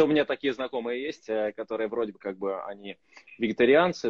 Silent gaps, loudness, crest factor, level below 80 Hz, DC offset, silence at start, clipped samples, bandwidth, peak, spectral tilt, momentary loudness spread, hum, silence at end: none; -28 LUFS; 18 dB; -66 dBFS; under 0.1%; 0 s; under 0.1%; 7.4 kHz; -8 dBFS; -5.5 dB/octave; 16 LU; none; 0 s